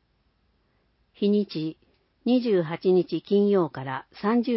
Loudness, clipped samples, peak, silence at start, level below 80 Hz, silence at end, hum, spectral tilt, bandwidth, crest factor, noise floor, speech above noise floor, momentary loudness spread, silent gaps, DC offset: -25 LUFS; under 0.1%; -12 dBFS; 1.2 s; -70 dBFS; 0 s; none; -11.5 dB/octave; 5.8 kHz; 14 dB; -68 dBFS; 45 dB; 11 LU; none; under 0.1%